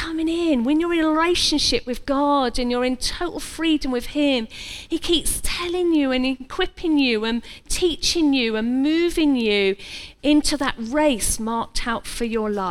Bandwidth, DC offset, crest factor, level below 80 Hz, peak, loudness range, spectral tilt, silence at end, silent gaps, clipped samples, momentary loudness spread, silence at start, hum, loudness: 14 kHz; under 0.1%; 16 dB; -36 dBFS; -6 dBFS; 2 LU; -3 dB/octave; 0 s; none; under 0.1%; 7 LU; 0 s; none; -21 LUFS